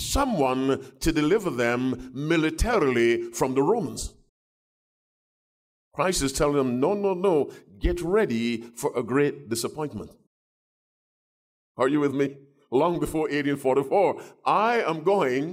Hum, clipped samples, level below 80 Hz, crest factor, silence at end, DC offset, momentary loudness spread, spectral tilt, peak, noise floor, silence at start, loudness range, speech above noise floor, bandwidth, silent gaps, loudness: none; under 0.1%; -42 dBFS; 14 dB; 0 s; under 0.1%; 8 LU; -5 dB/octave; -10 dBFS; under -90 dBFS; 0 s; 5 LU; over 66 dB; 16 kHz; 4.29-5.91 s, 10.27-11.75 s; -25 LUFS